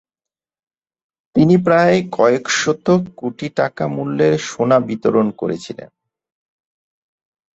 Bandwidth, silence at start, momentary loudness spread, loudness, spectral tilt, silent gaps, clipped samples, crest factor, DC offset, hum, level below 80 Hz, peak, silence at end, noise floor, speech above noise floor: 8 kHz; 1.35 s; 12 LU; -16 LUFS; -5.5 dB/octave; none; under 0.1%; 16 dB; under 0.1%; none; -56 dBFS; -2 dBFS; 1.7 s; -89 dBFS; 73 dB